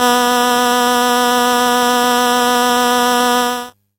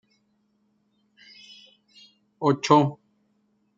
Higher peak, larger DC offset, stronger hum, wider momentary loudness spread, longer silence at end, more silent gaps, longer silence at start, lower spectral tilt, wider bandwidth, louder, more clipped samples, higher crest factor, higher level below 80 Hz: about the same, 0 dBFS vs -2 dBFS; neither; neither; second, 1 LU vs 27 LU; second, 0.3 s vs 0.85 s; neither; second, 0 s vs 2.4 s; second, -1 dB/octave vs -6 dB/octave; first, 17 kHz vs 7.8 kHz; first, -13 LUFS vs -22 LUFS; neither; second, 14 dB vs 26 dB; first, -56 dBFS vs -74 dBFS